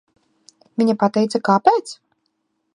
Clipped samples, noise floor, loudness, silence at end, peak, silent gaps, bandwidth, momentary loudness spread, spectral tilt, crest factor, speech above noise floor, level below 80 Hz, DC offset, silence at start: under 0.1%; -71 dBFS; -18 LUFS; 0.8 s; 0 dBFS; none; 11 kHz; 18 LU; -6 dB/octave; 20 dB; 54 dB; -66 dBFS; under 0.1%; 0.8 s